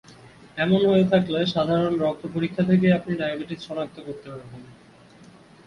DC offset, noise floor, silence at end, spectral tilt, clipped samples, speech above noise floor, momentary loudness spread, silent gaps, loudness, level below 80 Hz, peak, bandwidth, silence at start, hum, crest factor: under 0.1%; -50 dBFS; 0.45 s; -8 dB/octave; under 0.1%; 27 dB; 19 LU; none; -23 LUFS; -56 dBFS; -8 dBFS; 6.8 kHz; 0.55 s; none; 16 dB